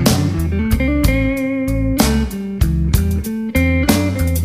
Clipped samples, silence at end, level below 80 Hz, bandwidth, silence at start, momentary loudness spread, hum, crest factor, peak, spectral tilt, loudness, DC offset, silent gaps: under 0.1%; 0 s; -22 dBFS; 15.5 kHz; 0 s; 5 LU; none; 16 dB; 0 dBFS; -5.5 dB/octave; -17 LUFS; 0.2%; none